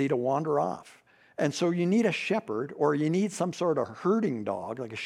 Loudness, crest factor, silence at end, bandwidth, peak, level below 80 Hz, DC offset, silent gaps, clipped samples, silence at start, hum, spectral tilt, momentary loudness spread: -28 LUFS; 16 dB; 0 s; 13 kHz; -12 dBFS; -78 dBFS; under 0.1%; none; under 0.1%; 0 s; none; -6 dB/octave; 9 LU